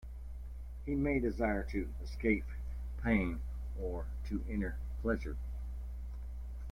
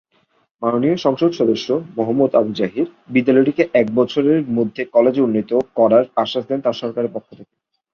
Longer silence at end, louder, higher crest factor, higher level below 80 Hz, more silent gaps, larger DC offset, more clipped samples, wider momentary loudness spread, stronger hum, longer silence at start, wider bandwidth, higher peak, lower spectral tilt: second, 0 s vs 0.5 s; second, -38 LUFS vs -17 LUFS; about the same, 18 dB vs 16 dB; first, -40 dBFS vs -60 dBFS; neither; neither; neither; first, 12 LU vs 8 LU; first, 60 Hz at -40 dBFS vs none; second, 0 s vs 0.6 s; first, 9.8 kHz vs 6.8 kHz; second, -18 dBFS vs -2 dBFS; first, -8.5 dB/octave vs -7 dB/octave